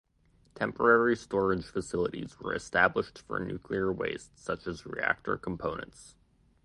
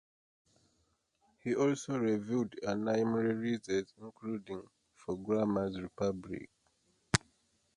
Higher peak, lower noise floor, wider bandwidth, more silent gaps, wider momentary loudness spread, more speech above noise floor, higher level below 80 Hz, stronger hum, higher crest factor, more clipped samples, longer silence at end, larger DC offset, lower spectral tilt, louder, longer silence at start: about the same, -8 dBFS vs -6 dBFS; second, -66 dBFS vs -77 dBFS; about the same, 11.5 kHz vs 11.5 kHz; neither; about the same, 12 LU vs 14 LU; second, 35 dB vs 42 dB; first, -56 dBFS vs -64 dBFS; neither; second, 24 dB vs 30 dB; neither; about the same, 0.55 s vs 0.6 s; neither; about the same, -5.5 dB/octave vs -5.5 dB/octave; first, -31 LUFS vs -35 LUFS; second, 0.55 s vs 1.45 s